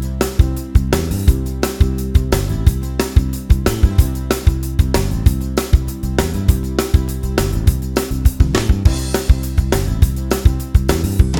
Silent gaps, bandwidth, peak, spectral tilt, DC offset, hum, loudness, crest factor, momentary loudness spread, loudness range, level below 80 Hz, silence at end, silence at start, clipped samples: none; 19.5 kHz; 0 dBFS; -6 dB/octave; under 0.1%; none; -17 LUFS; 14 dB; 4 LU; 1 LU; -18 dBFS; 0 s; 0 s; 0.2%